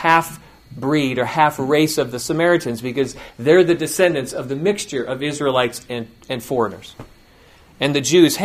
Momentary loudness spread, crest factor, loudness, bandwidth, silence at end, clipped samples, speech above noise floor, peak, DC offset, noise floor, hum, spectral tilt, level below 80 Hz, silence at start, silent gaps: 14 LU; 18 dB; -19 LUFS; 15.5 kHz; 0 s; under 0.1%; 30 dB; 0 dBFS; under 0.1%; -49 dBFS; none; -4.5 dB/octave; -52 dBFS; 0 s; none